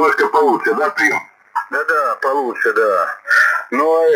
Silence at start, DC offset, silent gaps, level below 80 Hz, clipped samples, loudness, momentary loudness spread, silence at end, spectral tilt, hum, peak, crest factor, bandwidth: 0 s; under 0.1%; none; -72 dBFS; under 0.1%; -15 LUFS; 7 LU; 0 s; -3 dB/octave; none; -2 dBFS; 14 dB; 18.5 kHz